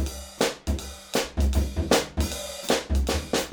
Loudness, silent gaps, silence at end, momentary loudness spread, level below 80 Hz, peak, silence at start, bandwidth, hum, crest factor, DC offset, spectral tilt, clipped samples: -27 LUFS; none; 0 s; 8 LU; -30 dBFS; -6 dBFS; 0 s; over 20 kHz; none; 20 dB; under 0.1%; -4 dB/octave; under 0.1%